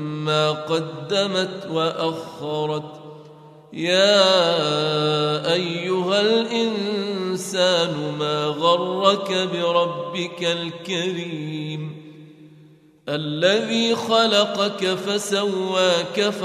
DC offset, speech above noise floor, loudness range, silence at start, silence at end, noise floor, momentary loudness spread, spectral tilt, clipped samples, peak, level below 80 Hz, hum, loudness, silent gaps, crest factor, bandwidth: under 0.1%; 29 dB; 6 LU; 0 s; 0 s; -50 dBFS; 11 LU; -4 dB/octave; under 0.1%; -2 dBFS; -70 dBFS; none; -21 LUFS; none; 20 dB; 14.5 kHz